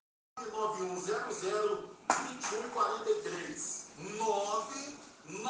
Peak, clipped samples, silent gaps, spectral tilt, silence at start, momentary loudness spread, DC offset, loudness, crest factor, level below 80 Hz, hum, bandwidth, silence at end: -12 dBFS; under 0.1%; none; -2.5 dB/octave; 0.35 s; 10 LU; under 0.1%; -35 LUFS; 24 dB; -78 dBFS; none; 10 kHz; 0 s